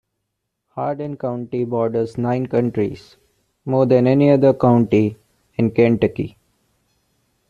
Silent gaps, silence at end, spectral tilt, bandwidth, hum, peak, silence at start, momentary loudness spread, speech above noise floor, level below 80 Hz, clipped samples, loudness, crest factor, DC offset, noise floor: none; 1.2 s; -9.5 dB/octave; 7.2 kHz; none; -2 dBFS; 0.75 s; 14 LU; 59 dB; -54 dBFS; under 0.1%; -18 LUFS; 16 dB; under 0.1%; -76 dBFS